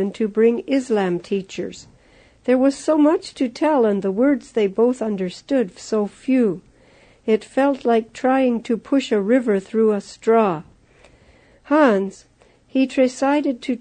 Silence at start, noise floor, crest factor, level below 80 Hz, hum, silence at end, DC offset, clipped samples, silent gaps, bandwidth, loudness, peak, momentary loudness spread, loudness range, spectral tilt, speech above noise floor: 0 s; -52 dBFS; 16 dB; -60 dBFS; none; 0.05 s; under 0.1%; under 0.1%; none; 9.6 kHz; -20 LUFS; -4 dBFS; 8 LU; 2 LU; -6 dB/octave; 33 dB